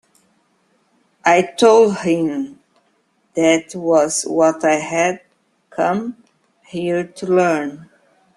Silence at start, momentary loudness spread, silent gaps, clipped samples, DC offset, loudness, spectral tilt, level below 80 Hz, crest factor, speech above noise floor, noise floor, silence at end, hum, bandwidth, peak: 1.25 s; 15 LU; none; under 0.1%; under 0.1%; -17 LUFS; -4.5 dB/octave; -64 dBFS; 18 dB; 47 dB; -63 dBFS; 0.55 s; none; 12.5 kHz; -2 dBFS